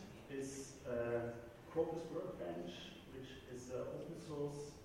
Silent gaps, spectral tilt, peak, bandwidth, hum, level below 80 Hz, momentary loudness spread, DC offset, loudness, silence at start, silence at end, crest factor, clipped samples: none; -5.5 dB/octave; -26 dBFS; 16 kHz; none; -68 dBFS; 11 LU; under 0.1%; -46 LUFS; 0 s; 0 s; 18 dB; under 0.1%